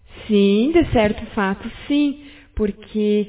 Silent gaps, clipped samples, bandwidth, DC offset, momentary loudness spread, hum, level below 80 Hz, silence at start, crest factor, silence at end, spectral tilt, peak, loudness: none; under 0.1%; 4 kHz; under 0.1%; 10 LU; none; -38 dBFS; 0.1 s; 16 dB; 0 s; -11 dB/octave; -4 dBFS; -19 LUFS